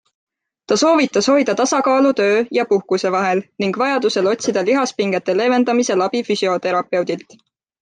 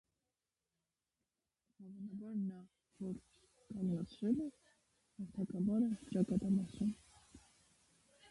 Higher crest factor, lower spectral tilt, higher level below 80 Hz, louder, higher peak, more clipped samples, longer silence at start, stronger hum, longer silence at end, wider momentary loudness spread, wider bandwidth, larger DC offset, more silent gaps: about the same, 14 dB vs 18 dB; second, -4 dB/octave vs -8.5 dB/octave; about the same, -66 dBFS vs -70 dBFS; first, -17 LUFS vs -40 LUFS; first, -4 dBFS vs -24 dBFS; neither; second, 0.7 s vs 1.8 s; neither; first, 0.65 s vs 0.05 s; second, 5 LU vs 16 LU; second, 9.6 kHz vs 11.5 kHz; neither; neither